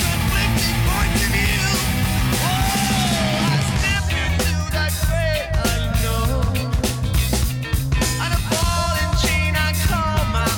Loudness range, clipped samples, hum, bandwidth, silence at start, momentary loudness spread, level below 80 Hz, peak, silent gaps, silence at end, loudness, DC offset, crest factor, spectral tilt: 2 LU; under 0.1%; none; 18 kHz; 0 s; 3 LU; -24 dBFS; -6 dBFS; none; 0 s; -19 LUFS; under 0.1%; 12 dB; -4 dB/octave